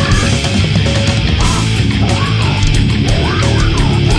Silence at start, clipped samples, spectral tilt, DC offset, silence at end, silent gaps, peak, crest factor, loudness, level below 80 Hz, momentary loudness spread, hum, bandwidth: 0 s; under 0.1%; -5 dB/octave; under 0.1%; 0 s; none; 0 dBFS; 12 dB; -12 LUFS; -18 dBFS; 1 LU; none; 11 kHz